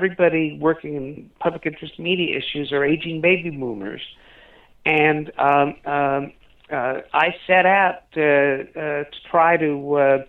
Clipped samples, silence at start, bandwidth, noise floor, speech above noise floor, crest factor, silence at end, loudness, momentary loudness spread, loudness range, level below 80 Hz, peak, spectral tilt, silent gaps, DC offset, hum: under 0.1%; 0 s; 4.3 kHz; -49 dBFS; 29 dB; 16 dB; 0.05 s; -20 LUFS; 12 LU; 4 LU; -56 dBFS; -4 dBFS; -8 dB/octave; none; under 0.1%; none